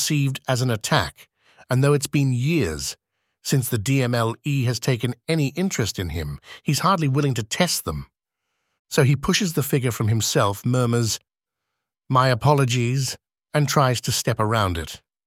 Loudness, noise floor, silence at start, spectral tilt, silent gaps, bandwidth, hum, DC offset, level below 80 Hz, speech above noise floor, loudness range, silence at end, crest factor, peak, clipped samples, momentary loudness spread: -22 LUFS; -83 dBFS; 0 s; -5 dB/octave; 8.79-8.85 s; 16.5 kHz; none; under 0.1%; -46 dBFS; 62 dB; 2 LU; 0.3 s; 20 dB; -2 dBFS; under 0.1%; 10 LU